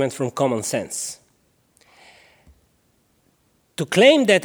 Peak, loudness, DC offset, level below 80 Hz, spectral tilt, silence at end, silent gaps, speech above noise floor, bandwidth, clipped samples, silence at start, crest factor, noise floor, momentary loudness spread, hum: -2 dBFS; -19 LUFS; under 0.1%; -64 dBFS; -4 dB/octave; 0 s; none; 45 dB; over 20 kHz; under 0.1%; 0 s; 20 dB; -63 dBFS; 19 LU; none